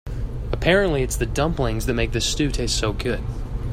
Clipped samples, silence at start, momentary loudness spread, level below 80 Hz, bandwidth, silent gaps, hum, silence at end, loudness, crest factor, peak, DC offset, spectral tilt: under 0.1%; 0.05 s; 11 LU; -28 dBFS; 16 kHz; none; none; 0 s; -23 LUFS; 18 dB; -4 dBFS; under 0.1%; -4.5 dB/octave